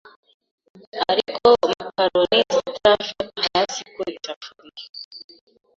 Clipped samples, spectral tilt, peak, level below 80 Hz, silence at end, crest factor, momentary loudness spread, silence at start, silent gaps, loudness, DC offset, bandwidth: under 0.1%; -3 dB/octave; -2 dBFS; -58 dBFS; 0.6 s; 20 dB; 20 LU; 0.95 s; 4.36-4.41 s, 4.89-4.94 s, 5.05-5.11 s; -20 LUFS; under 0.1%; 7.8 kHz